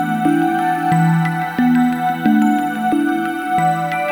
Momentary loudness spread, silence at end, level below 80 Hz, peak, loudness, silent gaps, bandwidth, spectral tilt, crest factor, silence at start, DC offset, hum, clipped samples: 4 LU; 0 s; -58 dBFS; -4 dBFS; -16 LUFS; none; over 20 kHz; -7 dB/octave; 12 dB; 0 s; under 0.1%; none; under 0.1%